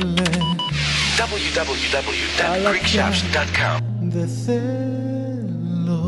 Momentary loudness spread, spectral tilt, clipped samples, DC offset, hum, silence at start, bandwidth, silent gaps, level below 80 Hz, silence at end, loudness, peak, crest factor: 7 LU; -4.5 dB/octave; under 0.1%; under 0.1%; none; 0 s; 11.5 kHz; none; -38 dBFS; 0 s; -20 LUFS; -6 dBFS; 16 dB